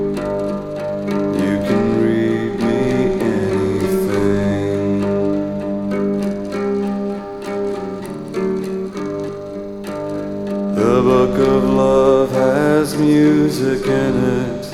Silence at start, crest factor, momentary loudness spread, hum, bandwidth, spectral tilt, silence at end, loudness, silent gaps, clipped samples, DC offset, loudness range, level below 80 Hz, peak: 0 s; 14 dB; 11 LU; none; 15.5 kHz; -7 dB/octave; 0 s; -18 LUFS; none; under 0.1%; 0.2%; 9 LU; -40 dBFS; -2 dBFS